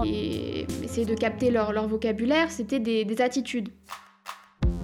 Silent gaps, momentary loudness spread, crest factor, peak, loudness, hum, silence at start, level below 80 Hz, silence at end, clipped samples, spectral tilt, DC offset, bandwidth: none; 18 LU; 16 dB; -10 dBFS; -27 LUFS; none; 0 s; -40 dBFS; 0 s; under 0.1%; -5.5 dB/octave; under 0.1%; 15.5 kHz